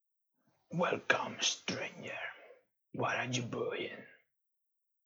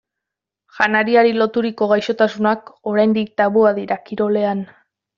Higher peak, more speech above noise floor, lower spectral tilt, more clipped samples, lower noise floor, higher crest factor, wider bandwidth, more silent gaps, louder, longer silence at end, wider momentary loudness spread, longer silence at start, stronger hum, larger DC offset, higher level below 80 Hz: second, -12 dBFS vs -2 dBFS; second, 48 dB vs 67 dB; about the same, -3 dB/octave vs -4 dB/octave; neither; about the same, -84 dBFS vs -84 dBFS; first, 26 dB vs 16 dB; first, over 20 kHz vs 7.2 kHz; neither; second, -36 LUFS vs -17 LUFS; first, 0.9 s vs 0.5 s; first, 13 LU vs 9 LU; about the same, 0.7 s vs 0.75 s; neither; neither; second, -84 dBFS vs -62 dBFS